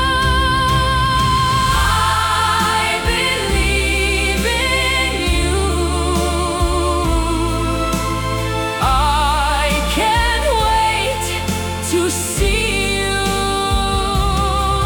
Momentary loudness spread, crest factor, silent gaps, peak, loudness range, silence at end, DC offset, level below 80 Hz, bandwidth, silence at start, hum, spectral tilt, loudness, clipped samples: 4 LU; 12 dB; none; -4 dBFS; 2 LU; 0 s; under 0.1%; -22 dBFS; 18 kHz; 0 s; none; -4 dB/octave; -16 LUFS; under 0.1%